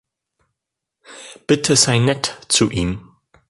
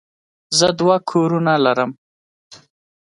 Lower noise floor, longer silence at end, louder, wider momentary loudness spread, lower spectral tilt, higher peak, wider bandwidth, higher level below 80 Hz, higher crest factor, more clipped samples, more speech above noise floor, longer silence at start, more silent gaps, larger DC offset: second, -82 dBFS vs under -90 dBFS; about the same, 0.5 s vs 0.55 s; about the same, -17 LUFS vs -17 LUFS; first, 21 LU vs 5 LU; about the same, -3.5 dB/octave vs -4.5 dB/octave; about the same, 0 dBFS vs 0 dBFS; about the same, 11.5 kHz vs 11.5 kHz; first, -42 dBFS vs -60 dBFS; about the same, 20 dB vs 18 dB; neither; second, 65 dB vs over 74 dB; first, 1.1 s vs 0.5 s; second, none vs 1.98-2.50 s; neither